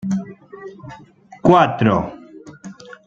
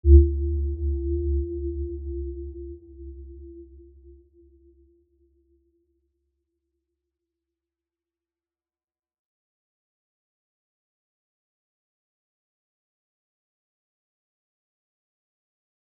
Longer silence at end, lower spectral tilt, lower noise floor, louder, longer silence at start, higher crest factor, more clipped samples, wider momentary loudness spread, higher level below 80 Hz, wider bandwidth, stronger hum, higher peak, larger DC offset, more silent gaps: second, 0.15 s vs 11.9 s; second, -7.5 dB/octave vs -19 dB/octave; second, -38 dBFS vs under -90 dBFS; first, -16 LUFS vs -26 LUFS; about the same, 0.05 s vs 0.05 s; second, 18 dB vs 26 dB; neither; first, 25 LU vs 21 LU; second, -50 dBFS vs -32 dBFS; first, 7.8 kHz vs 0.6 kHz; neither; about the same, -2 dBFS vs -2 dBFS; neither; neither